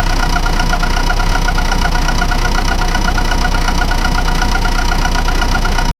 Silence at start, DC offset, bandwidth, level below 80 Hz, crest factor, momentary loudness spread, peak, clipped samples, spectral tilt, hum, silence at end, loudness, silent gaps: 0 s; under 0.1%; 14.5 kHz; -14 dBFS; 12 dB; 0 LU; 0 dBFS; under 0.1%; -4 dB/octave; none; 0.1 s; -16 LUFS; none